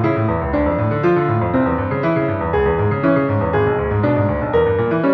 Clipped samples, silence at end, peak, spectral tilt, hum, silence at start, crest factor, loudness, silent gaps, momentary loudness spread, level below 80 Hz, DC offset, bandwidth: under 0.1%; 0 s; -4 dBFS; -10.5 dB/octave; none; 0 s; 14 dB; -17 LUFS; none; 2 LU; -34 dBFS; under 0.1%; 5.4 kHz